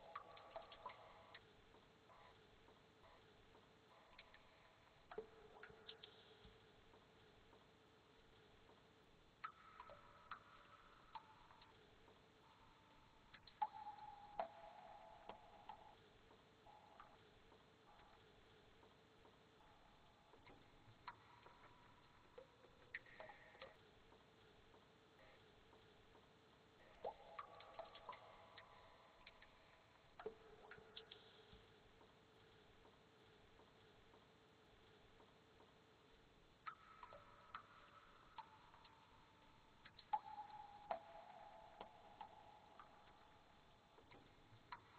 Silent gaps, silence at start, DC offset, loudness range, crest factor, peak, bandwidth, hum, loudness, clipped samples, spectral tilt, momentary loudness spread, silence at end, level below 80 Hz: none; 0 s; under 0.1%; 13 LU; 30 dB; -32 dBFS; 8.2 kHz; none; -61 LUFS; under 0.1%; -4.5 dB/octave; 14 LU; 0 s; -80 dBFS